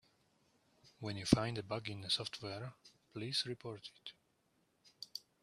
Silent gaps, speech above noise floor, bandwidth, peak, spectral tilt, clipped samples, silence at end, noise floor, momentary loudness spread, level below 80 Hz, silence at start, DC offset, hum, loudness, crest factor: none; 38 dB; 13.5 kHz; -12 dBFS; -4.5 dB/octave; under 0.1%; 0.25 s; -78 dBFS; 18 LU; -62 dBFS; 0.85 s; under 0.1%; none; -40 LUFS; 32 dB